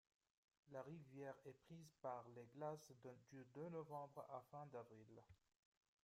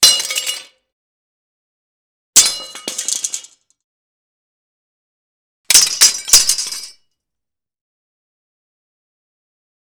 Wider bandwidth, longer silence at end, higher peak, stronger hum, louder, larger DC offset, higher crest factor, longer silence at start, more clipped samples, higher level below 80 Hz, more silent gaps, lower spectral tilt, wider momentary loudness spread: second, 15 kHz vs over 20 kHz; second, 0.7 s vs 2.95 s; second, -38 dBFS vs 0 dBFS; neither; second, -58 LUFS vs -12 LUFS; neither; about the same, 20 dB vs 20 dB; first, 0.65 s vs 0 s; neither; second, under -90 dBFS vs -54 dBFS; second, none vs 0.92-2.33 s, 3.84-5.64 s; first, -7 dB/octave vs 3 dB/octave; second, 10 LU vs 16 LU